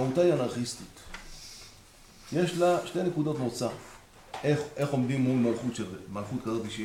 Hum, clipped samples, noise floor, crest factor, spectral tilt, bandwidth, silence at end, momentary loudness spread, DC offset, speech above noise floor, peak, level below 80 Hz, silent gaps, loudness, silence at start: none; under 0.1%; -54 dBFS; 16 dB; -6 dB/octave; 16 kHz; 0 s; 19 LU; under 0.1%; 25 dB; -14 dBFS; -56 dBFS; none; -29 LUFS; 0 s